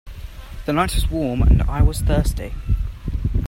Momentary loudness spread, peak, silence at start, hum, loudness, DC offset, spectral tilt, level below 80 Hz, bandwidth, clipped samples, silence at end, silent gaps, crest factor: 14 LU; -2 dBFS; 0.05 s; none; -21 LUFS; under 0.1%; -6.5 dB/octave; -22 dBFS; 16.5 kHz; under 0.1%; 0 s; none; 16 dB